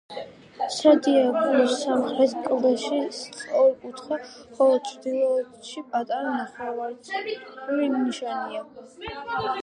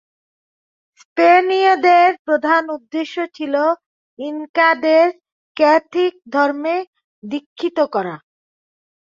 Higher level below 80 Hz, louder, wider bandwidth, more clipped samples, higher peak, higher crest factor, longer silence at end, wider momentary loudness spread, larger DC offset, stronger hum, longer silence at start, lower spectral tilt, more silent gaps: first, -64 dBFS vs -72 dBFS; second, -24 LUFS vs -16 LUFS; first, 10.5 kHz vs 7.4 kHz; neither; about the same, -4 dBFS vs -2 dBFS; about the same, 20 dB vs 16 dB; second, 0 s vs 0.9 s; about the same, 16 LU vs 16 LU; neither; neither; second, 0.1 s vs 1.15 s; about the same, -4 dB/octave vs -5 dB/octave; second, none vs 2.19-2.25 s, 3.86-4.17 s, 4.49-4.54 s, 5.32-5.55 s, 6.87-6.93 s, 7.04-7.22 s, 7.46-7.56 s